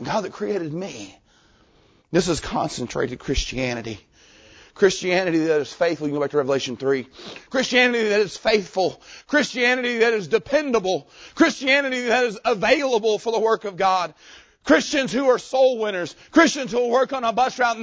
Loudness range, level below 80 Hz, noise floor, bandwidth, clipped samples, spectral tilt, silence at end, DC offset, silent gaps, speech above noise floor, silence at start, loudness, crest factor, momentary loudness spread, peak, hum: 6 LU; -46 dBFS; -57 dBFS; 8 kHz; under 0.1%; -4 dB/octave; 0 s; under 0.1%; none; 36 dB; 0 s; -21 LUFS; 20 dB; 9 LU; -2 dBFS; none